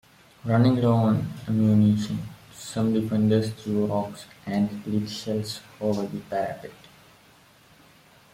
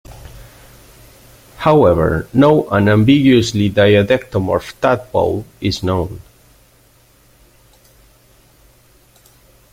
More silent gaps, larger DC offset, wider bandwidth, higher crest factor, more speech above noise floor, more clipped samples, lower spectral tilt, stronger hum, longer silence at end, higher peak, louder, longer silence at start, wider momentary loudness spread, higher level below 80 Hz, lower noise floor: neither; neither; about the same, 15.5 kHz vs 16 kHz; about the same, 16 dB vs 16 dB; second, 31 dB vs 38 dB; neither; about the same, -7.5 dB/octave vs -6.5 dB/octave; second, none vs 50 Hz at -40 dBFS; second, 1.6 s vs 3.55 s; second, -8 dBFS vs 0 dBFS; second, -25 LUFS vs -14 LUFS; first, 0.45 s vs 0.1 s; first, 15 LU vs 9 LU; second, -60 dBFS vs -40 dBFS; first, -55 dBFS vs -51 dBFS